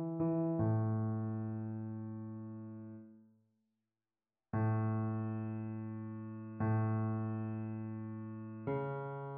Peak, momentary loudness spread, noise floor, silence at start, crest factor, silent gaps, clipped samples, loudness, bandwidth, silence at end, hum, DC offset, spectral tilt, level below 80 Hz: -24 dBFS; 12 LU; under -90 dBFS; 0 s; 14 dB; none; under 0.1%; -39 LUFS; 2.8 kHz; 0 s; none; under 0.1%; -11 dB/octave; -70 dBFS